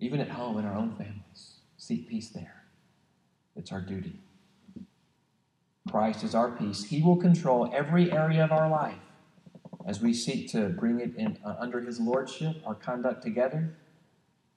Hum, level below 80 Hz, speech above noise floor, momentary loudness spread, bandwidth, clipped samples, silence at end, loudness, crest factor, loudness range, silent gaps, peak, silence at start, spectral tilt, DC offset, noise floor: none; -74 dBFS; 45 dB; 20 LU; 10.5 kHz; under 0.1%; 0.8 s; -29 LUFS; 20 dB; 15 LU; none; -10 dBFS; 0 s; -7 dB/octave; under 0.1%; -73 dBFS